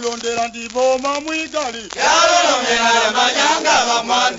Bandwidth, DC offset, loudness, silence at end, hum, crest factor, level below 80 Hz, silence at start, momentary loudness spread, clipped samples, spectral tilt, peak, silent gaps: 8 kHz; under 0.1%; -15 LUFS; 0 s; none; 16 dB; -52 dBFS; 0 s; 10 LU; under 0.1%; -0.5 dB/octave; -2 dBFS; none